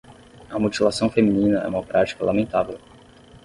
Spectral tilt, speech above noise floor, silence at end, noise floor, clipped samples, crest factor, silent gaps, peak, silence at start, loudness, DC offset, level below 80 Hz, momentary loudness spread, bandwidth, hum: -6 dB/octave; 27 dB; 0.05 s; -48 dBFS; under 0.1%; 18 dB; none; -4 dBFS; 0.1 s; -22 LUFS; under 0.1%; -50 dBFS; 9 LU; 11.5 kHz; none